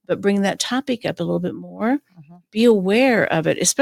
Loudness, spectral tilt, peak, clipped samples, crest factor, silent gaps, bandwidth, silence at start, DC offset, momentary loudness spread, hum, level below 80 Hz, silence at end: -19 LUFS; -4 dB/octave; -4 dBFS; under 0.1%; 16 dB; none; 16.5 kHz; 0.1 s; under 0.1%; 9 LU; none; -62 dBFS; 0 s